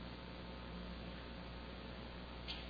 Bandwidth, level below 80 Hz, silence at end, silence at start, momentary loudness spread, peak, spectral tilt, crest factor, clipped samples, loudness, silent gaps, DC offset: 5 kHz; -54 dBFS; 0 s; 0 s; 1 LU; -32 dBFS; -4 dB/octave; 16 dB; under 0.1%; -50 LUFS; none; under 0.1%